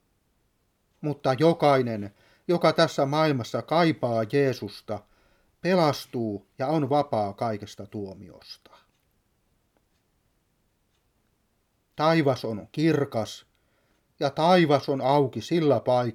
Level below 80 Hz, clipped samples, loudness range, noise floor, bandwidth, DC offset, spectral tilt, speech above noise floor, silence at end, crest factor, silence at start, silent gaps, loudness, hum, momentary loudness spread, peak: -68 dBFS; under 0.1%; 8 LU; -71 dBFS; 16 kHz; under 0.1%; -6.5 dB/octave; 47 dB; 0 s; 20 dB; 1 s; none; -25 LUFS; none; 16 LU; -6 dBFS